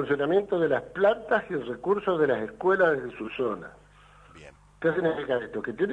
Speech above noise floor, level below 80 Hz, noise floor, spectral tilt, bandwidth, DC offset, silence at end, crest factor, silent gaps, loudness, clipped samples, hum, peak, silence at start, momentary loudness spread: 28 dB; -60 dBFS; -54 dBFS; -7.5 dB/octave; 9.6 kHz; under 0.1%; 0 s; 18 dB; none; -26 LUFS; under 0.1%; 50 Hz at -55 dBFS; -10 dBFS; 0 s; 9 LU